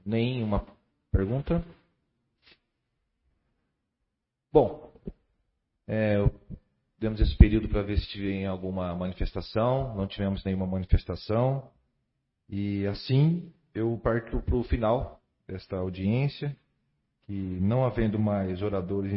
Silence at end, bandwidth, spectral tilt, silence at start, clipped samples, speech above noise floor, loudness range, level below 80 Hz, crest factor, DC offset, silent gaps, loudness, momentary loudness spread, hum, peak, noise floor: 0 s; 5.8 kHz; -11.5 dB/octave; 0.05 s; under 0.1%; 56 dB; 6 LU; -34 dBFS; 28 dB; under 0.1%; none; -28 LUFS; 14 LU; none; 0 dBFS; -82 dBFS